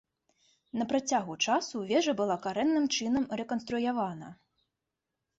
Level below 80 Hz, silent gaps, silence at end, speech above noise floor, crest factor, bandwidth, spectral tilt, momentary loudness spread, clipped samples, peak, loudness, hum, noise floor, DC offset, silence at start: -68 dBFS; none; 1.05 s; 57 dB; 18 dB; 8 kHz; -3.5 dB/octave; 8 LU; under 0.1%; -14 dBFS; -30 LUFS; none; -87 dBFS; under 0.1%; 0.75 s